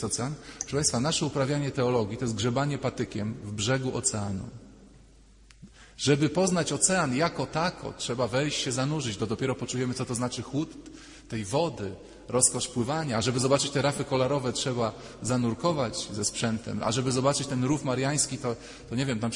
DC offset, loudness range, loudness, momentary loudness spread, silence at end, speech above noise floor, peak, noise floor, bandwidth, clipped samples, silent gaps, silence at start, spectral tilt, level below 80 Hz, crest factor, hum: under 0.1%; 4 LU; -28 LUFS; 10 LU; 0 s; 26 dB; -6 dBFS; -55 dBFS; 11 kHz; under 0.1%; none; 0 s; -4 dB/octave; -54 dBFS; 22 dB; none